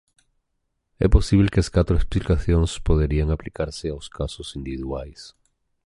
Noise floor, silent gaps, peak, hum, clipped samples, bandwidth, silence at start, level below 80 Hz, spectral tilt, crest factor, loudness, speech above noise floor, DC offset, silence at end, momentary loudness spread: -75 dBFS; none; -2 dBFS; none; under 0.1%; 11.5 kHz; 1 s; -26 dBFS; -7 dB/octave; 20 dB; -23 LUFS; 54 dB; under 0.1%; 0.55 s; 13 LU